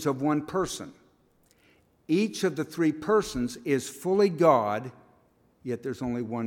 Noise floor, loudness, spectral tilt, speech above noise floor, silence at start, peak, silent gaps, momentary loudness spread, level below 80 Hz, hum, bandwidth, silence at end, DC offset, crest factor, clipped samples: -64 dBFS; -27 LUFS; -5.5 dB/octave; 38 dB; 0 s; -8 dBFS; none; 13 LU; -58 dBFS; none; 18 kHz; 0 s; under 0.1%; 20 dB; under 0.1%